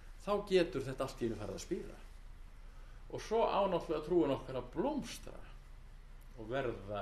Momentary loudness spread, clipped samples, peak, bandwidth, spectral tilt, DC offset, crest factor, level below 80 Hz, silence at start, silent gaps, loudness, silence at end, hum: 25 LU; under 0.1%; -18 dBFS; 13.5 kHz; -6 dB/octave; under 0.1%; 20 dB; -52 dBFS; 0 s; none; -37 LUFS; 0 s; none